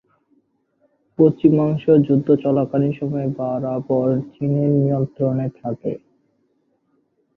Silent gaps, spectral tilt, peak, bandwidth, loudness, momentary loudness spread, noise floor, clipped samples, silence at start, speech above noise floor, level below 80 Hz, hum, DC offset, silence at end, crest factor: none; -12 dB/octave; -2 dBFS; 4 kHz; -19 LUFS; 11 LU; -66 dBFS; under 0.1%; 1.2 s; 48 dB; -58 dBFS; none; under 0.1%; 1.4 s; 18 dB